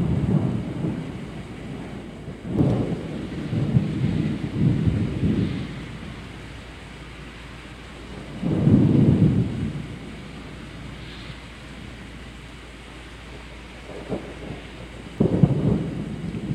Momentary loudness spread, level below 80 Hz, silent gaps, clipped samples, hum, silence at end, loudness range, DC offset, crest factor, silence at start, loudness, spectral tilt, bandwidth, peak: 20 LU; -40 dBFS; none; under 0.1%; none; 0 s; 15 LU; under 0.1%; 22 dB; 0 s; -24 LUFS; -8.5 dB/octave; 10.5 kHz; -2 dBFS